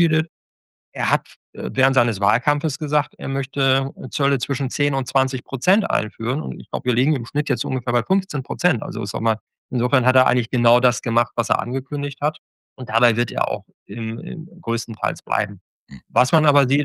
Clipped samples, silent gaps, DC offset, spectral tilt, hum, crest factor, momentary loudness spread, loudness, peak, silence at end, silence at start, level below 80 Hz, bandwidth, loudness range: under 0.1%; 0.29-0.92 s, 1.36-1.53 s, 9.41-9.47 s, 9.58-9.69 s, 12.38-12.76 s, 13.74-13.86 s, 15.61-15.87 s; under 0.1%; -5.5 dB/octave; none; 20 dB; 11 LU; -21 LUFS; -2 dBFS; 0 s; 0 s; -64 dBFS; 12.5 kHz; 4 LU